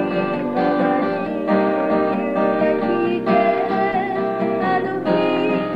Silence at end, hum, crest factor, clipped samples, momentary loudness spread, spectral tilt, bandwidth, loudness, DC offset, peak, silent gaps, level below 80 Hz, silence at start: 0 s; none; 14 dB; under 0.1%; 4 LU; -8.5 dB/octave; 7.6 kHz; -19 LUFS; 0.3%; -6 dBFS; none; -54 dBFS; 0 s